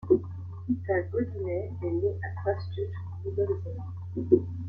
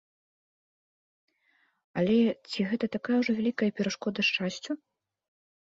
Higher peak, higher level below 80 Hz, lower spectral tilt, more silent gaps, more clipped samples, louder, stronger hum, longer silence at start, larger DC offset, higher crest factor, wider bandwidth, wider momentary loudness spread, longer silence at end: first, -6 dBFS vs -14 dBFS; first, -58 dBFS vs -70 dBFS; first, -11 dB/octave vs -5.5 dB/octave; neither; neither; about the same, -31 LUFS vs -29 LUFS; neither; second, 0 s vs 1.95 s; neither; first, 22 dB vs 16 dB; second, 5.2 kHz vs 7.8 kHz; about the same, 11 LU vs 11 LU; second, 0 s vs 0.9 s